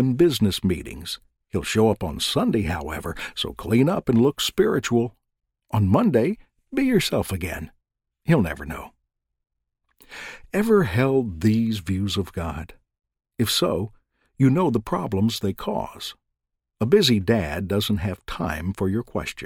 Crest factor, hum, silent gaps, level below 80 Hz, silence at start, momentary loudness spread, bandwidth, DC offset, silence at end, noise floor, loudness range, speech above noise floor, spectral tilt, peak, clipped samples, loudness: 18 dB; none; none; -44 dBFS; 0 s; 14 LU; 17 kHz; under 0.1%; 0 s; -81 dBFS; 4 LU; 59 dB; -5.5 dB/octave; -4 dBFS; under 0.1%; -23 LUFS